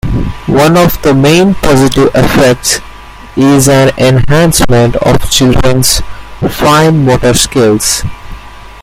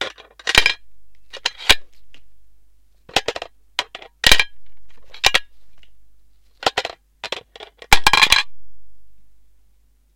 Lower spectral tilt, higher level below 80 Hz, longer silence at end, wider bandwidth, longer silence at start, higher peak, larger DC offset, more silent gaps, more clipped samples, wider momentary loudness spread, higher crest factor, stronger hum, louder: first, -4.5 dB/octave vs -0.5 dB/octave; first, -22 dBFS vs -36 dBFS; second, 0 s vs 0.8 s; about the same, 17 kHz vs 17 kHz; about the same, 0.05 s vs 0 s; about the same, 0 dBFS vs 0 dBFS; neither; neither; first, 0.3% vs under 0.1%; second, 8 LU vs 18 LU; second, 8 dB vs 20 dB; neither; first, -7 LUFS vs -17 LUFS